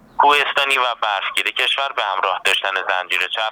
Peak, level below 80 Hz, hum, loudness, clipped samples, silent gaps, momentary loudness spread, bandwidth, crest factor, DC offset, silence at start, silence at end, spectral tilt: -2 dBFS; -64 dBFS; none; -17 LUFS; under 0.1%; none; 5 LU; over 20 kHz; 18 dB; under 0.1%; 0.2 s; 0 s; 0.5 dB/octave